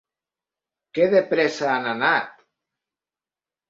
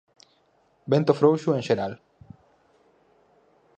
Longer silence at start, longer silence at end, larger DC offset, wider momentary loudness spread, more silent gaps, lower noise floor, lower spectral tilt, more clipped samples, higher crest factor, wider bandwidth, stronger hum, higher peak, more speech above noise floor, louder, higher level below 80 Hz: about the same, 0.95 s vs 0.85 s; second, 1.4 s vs 1.85 s; neither; second, 8 LU vs 20 LU; neither; first, under -90 dBFS vs -65 dBFS; second, -5 dB/octave vs -7.5 dB/octave; neither; about the same, 20 dB vs 24 dB; second, 7.8 kHz vs 8.6 kHz; neither; about the same, -6 dBFS vs -4 dBFS; first, over 70 dB vs 43 dB; about the same, -21 LUFS vs -23 LUFS; second, -70 dBFS vs -64 dBFS